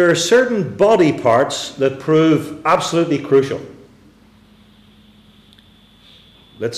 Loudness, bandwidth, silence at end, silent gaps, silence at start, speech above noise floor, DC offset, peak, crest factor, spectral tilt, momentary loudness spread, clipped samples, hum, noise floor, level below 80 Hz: -15 LUFS; 14.5 kHz; 0 s; none; 0 s; 34 dB; under 0.1%; -4 dBFS; 14 dB; -5 dB/octave; 8 LU; under 0.1%; 50 Hz at -50 dBFS; -48 dBFS; -56 dBFS